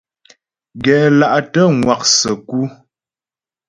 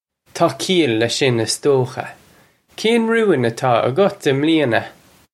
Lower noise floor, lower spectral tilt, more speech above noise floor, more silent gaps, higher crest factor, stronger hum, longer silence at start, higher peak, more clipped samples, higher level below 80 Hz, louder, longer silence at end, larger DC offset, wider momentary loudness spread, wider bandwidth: first, under -90 dBFS vs -52 dBFS; about the same, -4 dB/octave vs -5 dB/octave; first, over 77 dB vs 36 dB; neither; about the same, 16 dB vs 16 dB; neither; first, 0.75 s vs 0.35 s; about the same, 0 dBFS vs -2 dBFS; neither; first, -50 dBFS vs -62 dBFS; first, -13 LUFS vs -17 LUFS; first, 1 s vs 0.45 s; neither; about the same, 10 LU vs 8 LU; second, 11 kHz vs 14.5 kHz